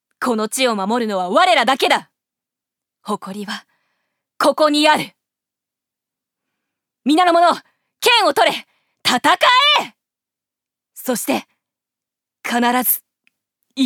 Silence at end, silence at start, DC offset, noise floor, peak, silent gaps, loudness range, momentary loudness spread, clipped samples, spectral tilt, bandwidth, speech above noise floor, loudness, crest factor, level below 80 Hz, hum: 0 s; 0.2 s; under 0.1%; -87 dBFS; -2 dBFS; none; 7 LU; 15 LU; under 0.1%; -2.5 dB/octave; 19.5 kHz; 71 dB; -16 LUFS; 18 dB; -70 dBFS; none